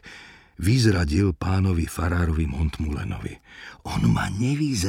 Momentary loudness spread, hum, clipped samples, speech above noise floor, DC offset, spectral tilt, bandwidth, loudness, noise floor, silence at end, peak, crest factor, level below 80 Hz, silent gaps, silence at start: 18 LU; none; under 0.1%; 23 dB; under 0.1%; -6 dB/octave; 16 kHz; -24 LUFS; -46 dBFS; 0 s; -6 dBFS; 16 dB; -34 dBFS; none; 0.05 s